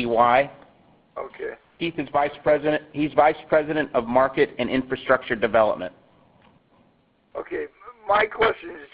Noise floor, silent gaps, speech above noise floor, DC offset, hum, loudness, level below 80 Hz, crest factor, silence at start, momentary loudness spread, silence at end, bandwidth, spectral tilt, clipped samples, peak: -62 dBFS; none; 40 dB; under 0.1%; none; -22 LUFS; -54 dBFS; 20 dB; 0 s; 17 LU; 0.1 s; 5 kHz; -10 dB/octave; under 0.1%; -4 dBFS